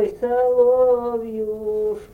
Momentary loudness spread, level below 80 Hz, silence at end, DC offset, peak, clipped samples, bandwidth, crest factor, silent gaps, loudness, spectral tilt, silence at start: 10 LU; -50 dBFS; 0.1 s; under 0.1%; -6 dBFS; under 0.1%; 3.2 kHz; 12 dB; none; -20 LUFS; -7.5 dB/octave; 0 s